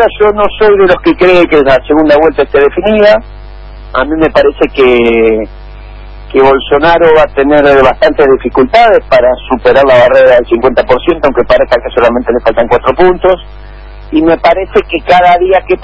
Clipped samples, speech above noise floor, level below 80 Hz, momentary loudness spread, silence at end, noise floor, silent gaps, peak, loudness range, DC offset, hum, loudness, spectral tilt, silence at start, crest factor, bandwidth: 1%; 20 dB; -28 dBFS; 5 LU; 0 s; -26 dBFS; none; 0 dBFS; 3 LU; under 0.1%; none; -7 LUFS; -7 dB/octave; 0 s; 6 dB; 8 kHz